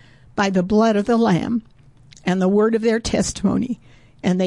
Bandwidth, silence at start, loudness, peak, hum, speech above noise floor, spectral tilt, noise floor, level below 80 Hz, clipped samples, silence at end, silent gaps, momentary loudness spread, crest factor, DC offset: 11.5 kHz; 0.35 s; -19 LUFS; -8 dBFS; none; 30 dB; -6 dB/octave; -48 dBFS; -44 dBFS; under 0.1%; 0 s; none; 10 LU; 12 dB; 0.1%